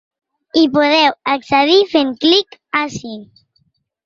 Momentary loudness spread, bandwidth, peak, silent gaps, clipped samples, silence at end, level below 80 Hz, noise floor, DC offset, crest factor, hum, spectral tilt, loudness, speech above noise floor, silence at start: 13 LU; 7.6 kHz; 0 dBFS; none; under 0.1%; 0.8 s; -58 dBFS; -63 dBFS; under 0.1%; 14 dB; none; -4 dB/octave; -14 LUFS; 48 dB; 0.55 s